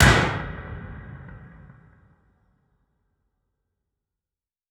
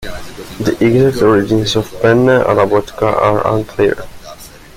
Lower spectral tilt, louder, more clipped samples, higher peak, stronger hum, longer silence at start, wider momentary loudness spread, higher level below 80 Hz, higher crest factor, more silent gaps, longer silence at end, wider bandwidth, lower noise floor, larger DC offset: second, -4.5 dB/octave vs -6.5 dB/octave; second, -24 LUFS vs -13 LUFS; neither; about the same, -2 dBFS vs 0 dBFS; neither; about the same, 0 s vs 0 s; first, 26 LU vs 18 LU; about the same, -36 dBFS vs -36 dBFS; first, 26 dB vs 14 dB; neither; first, 3.3 s vs 0.2 s; about the same, 16 kHz vs 16 kHz; first, under -90 dBFS vs -34 dBFS; neither